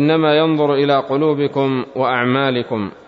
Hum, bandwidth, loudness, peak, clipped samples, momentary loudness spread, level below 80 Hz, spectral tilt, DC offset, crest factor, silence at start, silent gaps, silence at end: none; 6 kHz; -16 LUFS; -2 dBFS; under 0.1%; 6 LU; -60 dBFS; -8.5 dB/octave; under 0.1%; 14 dB; 0 s; none; 0.15 s